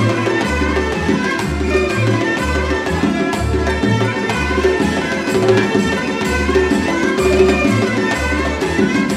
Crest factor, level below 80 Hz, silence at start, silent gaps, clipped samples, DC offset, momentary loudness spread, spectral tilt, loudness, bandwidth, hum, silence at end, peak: 14 dB; -28 dBFS; 0 s; none; under 0.1%; under 0.1%; 4 LU; -5.5 dB/octave; -16 LUFS; 14.5 kHz; none; 0 s; 0 dBFS